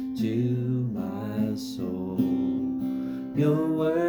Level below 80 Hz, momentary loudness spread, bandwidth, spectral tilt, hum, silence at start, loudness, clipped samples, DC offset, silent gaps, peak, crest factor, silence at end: -60 dBFS; 7 LU; 20 kHz; -8.5 dB/octave; none; 0 s; -28 LUFS; under 0.1%; under 0.1%; none; -12 dBFS; 14 dB; 0 s